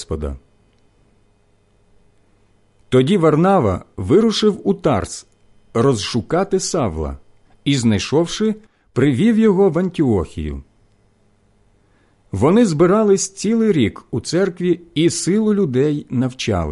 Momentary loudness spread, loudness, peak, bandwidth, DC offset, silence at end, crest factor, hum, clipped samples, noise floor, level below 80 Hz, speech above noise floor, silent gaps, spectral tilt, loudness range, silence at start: 13 LU; -17 LUFS; -4 dBFS; 11.5 kHz; under 0.1%; 0 s; 14 dB; none; under 0.1%; -57 dBFS; -38 dBFS; 41 dB; none; -6 dB/octave; 4 LU; 0 s